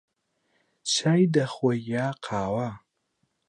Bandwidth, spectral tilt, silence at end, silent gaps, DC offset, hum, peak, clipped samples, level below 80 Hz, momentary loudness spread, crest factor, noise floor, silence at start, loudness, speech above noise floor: 11 kHz; -5 dB/octave; 0.7 s; none; under 0.1%; none; -10 dBFS; under 0.1%; -62 dBFS; 10 LU; 18 dB; -75 dBFS; 0.85 s; -26 LUFS; 50 dB